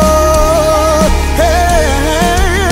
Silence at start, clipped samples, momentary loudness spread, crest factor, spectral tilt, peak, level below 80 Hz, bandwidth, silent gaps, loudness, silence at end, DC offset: 0 s; under 0.1%; 2 LU; 10 dB; -4.5 dB/octave; 0 dBFS; -14 dBFS; 16.5 kHz; none; -10 LUFS; 0 s; under 0.1%